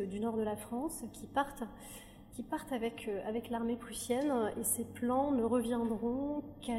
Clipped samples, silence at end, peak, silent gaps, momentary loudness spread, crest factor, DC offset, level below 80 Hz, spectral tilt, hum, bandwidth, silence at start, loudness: under 0.1%; 0 s; -18 dBFS; none; 13 LU; 18 dB; under 0.1%; -60 dBFS; -4.5 dB/octave; none; 16 kHz; 0 s; -36 LUFS